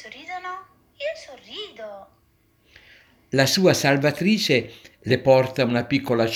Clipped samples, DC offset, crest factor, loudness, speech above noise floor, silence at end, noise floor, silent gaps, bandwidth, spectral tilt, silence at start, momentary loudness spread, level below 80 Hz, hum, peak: under 0.1%; under 0.1%; 20 dB; -21 LUFS; 41 dB; 0 s; -62 dBFS; none; 17 kHz; -5 dB/octave; 0 s; 20 LU; -60 dBFS; none; -2 dBFS